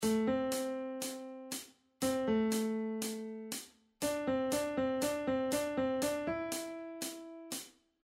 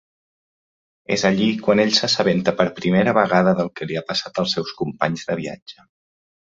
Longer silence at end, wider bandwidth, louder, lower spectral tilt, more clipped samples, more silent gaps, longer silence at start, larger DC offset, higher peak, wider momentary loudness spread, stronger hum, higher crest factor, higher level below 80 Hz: second, 0.35 s vs 0.85 s; first, 16 kHz vs 7.8 kHz; second, -36 LUFS vs -19 LUFS; about the same, -4 dB/octave vs -5 dB/octave; neither; second, none vs 5.62-5.66 s; second, 0 s vs 1.1 s; neither; second, -22 dBFS vs -2 dBFS; about the same, 11 LU vs 10 LU; neither; second, 14 dB vs 20 dB; second, -66 dBFS vs -56 dBFS